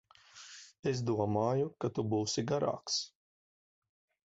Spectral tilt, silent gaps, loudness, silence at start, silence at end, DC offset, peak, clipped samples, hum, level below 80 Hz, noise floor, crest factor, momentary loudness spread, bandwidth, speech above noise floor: -5.5 dB/octave; 0.79-0.83 s; -34 LUFS; 0.35 s; 1.3 s; under 0.1%; -18 dBFS; under 0.1%; none; -68 dBFS; -55 dBFS; 18 dB; 18 LU; 8 kHz; 22 dB